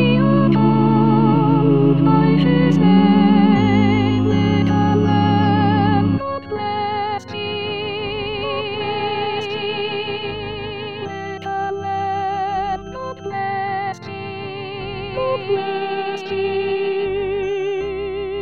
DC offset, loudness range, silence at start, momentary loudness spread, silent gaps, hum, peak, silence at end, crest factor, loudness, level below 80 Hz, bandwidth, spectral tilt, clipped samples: 0.6%; 10 LU; 0 s; 13 LU; none; none; -2 dBFS; 0 s; 16 dB; -18 LUFS; -44 dBFS; 7 kHz; -8 dB/octave; under 0.1%